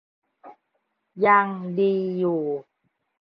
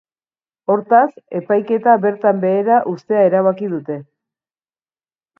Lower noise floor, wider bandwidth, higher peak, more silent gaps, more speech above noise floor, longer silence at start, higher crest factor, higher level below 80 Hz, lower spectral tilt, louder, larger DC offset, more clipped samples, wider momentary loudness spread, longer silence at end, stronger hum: second, -75 dBFS vs under -90 dBFS; second, 5.2 kHz vs 5.8 kHz; second, -6 dBFS vs 0 dBFS; neither; second, 53 dB vs over 75 dB; second, 0.45 s vs 0.7 s; about the same, 20 dB vs 16 dB; about the same, -72 dBFS vs -70 dBFS; about the same, -10 dB/octave vs -9.5 dB/octave; second, -23 LUFS vs -16 LUFS; neither; neither; about the same, 10 LU vs 12 LU; second, 0.6 s vs 1.35 s; neither